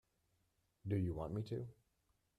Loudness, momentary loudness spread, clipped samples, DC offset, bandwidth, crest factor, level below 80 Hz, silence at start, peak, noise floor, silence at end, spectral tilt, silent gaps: -43 LUFS; 13 LU; under 0.1%; under 0.1%; 11 kHz; 18 dB; -64 dBFS; 0.85 s; -28 dBFS; -82 dBFS; 0.65 s; -9.5 dB/octave; none